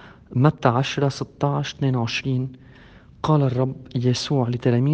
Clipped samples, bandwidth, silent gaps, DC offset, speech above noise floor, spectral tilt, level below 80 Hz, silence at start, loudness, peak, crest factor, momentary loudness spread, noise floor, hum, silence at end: under 0.1%; 8.6 kHz; none; under 0.1%; 26 dB; -6.5 dB/octave; -54 dBFS; 0.05 s; -22 LUFS; -2 dBFS; 20 dB; 6 LU; -47 dBFS; none; 0 s